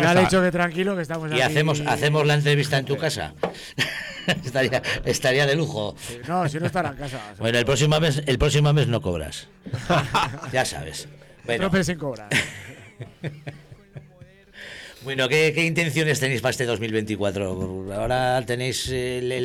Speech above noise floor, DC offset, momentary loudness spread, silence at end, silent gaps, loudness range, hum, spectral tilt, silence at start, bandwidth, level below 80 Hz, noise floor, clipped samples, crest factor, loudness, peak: 26 dB; under 0.1%; 16 LU; 0 s; none; 6 LU; none; -5 dB/octave; 0 s; 16 kHz; -44 dBFS; -49 dBFS; under 0.1%; 18 dB; -23 LUFS; -6 dBFS